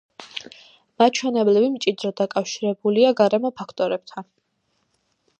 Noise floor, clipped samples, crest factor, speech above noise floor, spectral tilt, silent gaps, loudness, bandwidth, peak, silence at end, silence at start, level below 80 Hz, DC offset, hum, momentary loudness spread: -71 dBFS; under 0.1%; 18 dB; 50 dB; -4.5 dB/octave; none; -21 LUFS; 8.8 kHz; -4 dBFS; 1.15 s; 0.2 s; -74 dBFS; under 0.1%; none; 17 LU